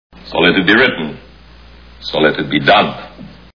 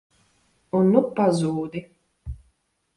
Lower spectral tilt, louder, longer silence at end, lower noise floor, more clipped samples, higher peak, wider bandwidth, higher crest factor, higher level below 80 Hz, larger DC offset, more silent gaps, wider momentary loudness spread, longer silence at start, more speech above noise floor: about the same, -6.5 dB/octave vs -7.5 dB/octave; first, -13 LUFS vs -22 LUFS; second, 0.3 s vs 0.6 s; second, -40 dBFS vs -68 dBFS; neither; first, 0 dBFS vs -4 dBFS; second, 5.4 kHz vs 11.5 kHz; second, 16 dB vs 22 dB; first, -42 dBFS vs -48 dBFS; first, 0.4% vs under 0.1%; neither; second, 18 LU vs 22 LU; second, 0.25 s vs 0.75 s; second, 27 dB vs 47 dB